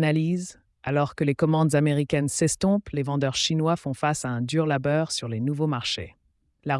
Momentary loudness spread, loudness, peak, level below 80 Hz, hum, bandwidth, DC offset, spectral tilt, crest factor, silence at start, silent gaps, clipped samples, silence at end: 7 LU; -25 LUFS; -10 dBFS; -56 dBFS; none; 12 kHz; under 0.1%; -5 dB/octave; 16 dB; 0 s; none; under 0.1%; 0 s